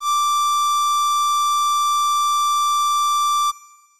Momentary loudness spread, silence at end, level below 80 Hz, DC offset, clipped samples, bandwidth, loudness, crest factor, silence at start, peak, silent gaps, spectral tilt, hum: 1 LU; 0.35 s; -76 dBFS; 0.6%; under 0.1%; 15.5 kHz; -18 LUFS; 4 dB; 0 s; -16 dBFS; none; 7.5 dB/octave; none